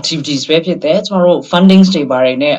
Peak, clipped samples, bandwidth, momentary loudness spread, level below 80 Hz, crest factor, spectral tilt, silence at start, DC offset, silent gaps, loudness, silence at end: 0 dBFS; 0.4%; 8 kHz; 7 LU; -52 dBFS; 10 dB; -6 dB/octave; 0 s; under 0.1%; none; -11 LUFS; 0 s